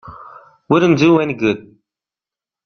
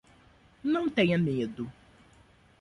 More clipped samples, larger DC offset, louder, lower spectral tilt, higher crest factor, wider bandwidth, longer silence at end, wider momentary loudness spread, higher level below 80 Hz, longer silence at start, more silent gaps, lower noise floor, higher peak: neither; neither; first, -14 LUFS vs -29 LUFS; about the same, -7 dB/octave vs -7.5 dB/octave; about the same, 16 dB vs 18 dB; second, 6.6 kHz vs 11 kHz; first, 1.05 s vs 0.9 s; about the same, 13 LU vs 14 LU; first, -54 dBFS vs -62 dBFS; second, 0.05 s vs 0.65 s; neither; first, -89 dBFS vs -60 dBFS; first, -2 dBFS vs -14 dBFS